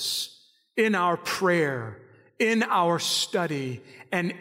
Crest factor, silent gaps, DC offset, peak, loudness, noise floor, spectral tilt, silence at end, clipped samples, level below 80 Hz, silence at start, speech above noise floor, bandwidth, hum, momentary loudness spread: 14 dB; none; under 0.1%; -12 dBFS; -25 LUFS; -55 dBFS; -3.5 dB/octave; 0 s; under 0.1%; -76 dBFS; 0 s; 29 dB; 16 kHz; none; 12 LU